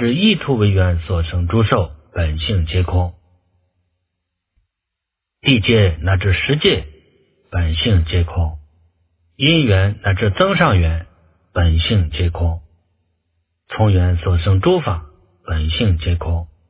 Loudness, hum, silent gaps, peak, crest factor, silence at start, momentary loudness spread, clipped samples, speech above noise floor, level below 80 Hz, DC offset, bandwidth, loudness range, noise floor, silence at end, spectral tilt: -17 LUFS; none; none; 0 dBFS; 18 dB; 0 s; 10 LU; under 0.1%; 66 dB; -24 dBFS; under 0.1%; 4 kHz; 4 LU; -81 dBFS; 0.25 s; -10.5 dB/octave